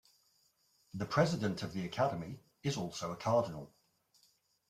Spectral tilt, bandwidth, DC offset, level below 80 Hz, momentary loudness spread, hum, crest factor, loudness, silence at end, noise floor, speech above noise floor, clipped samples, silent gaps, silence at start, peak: -6 dB/octave; 15 kHz; under 0.1%; -70 dBFS; 16 LU; none; 24 dB; -36 LUFS; 1.05 s; -74 dBFS; 38 dB; under 0.1%; none; 0.95 s; -14 dBFS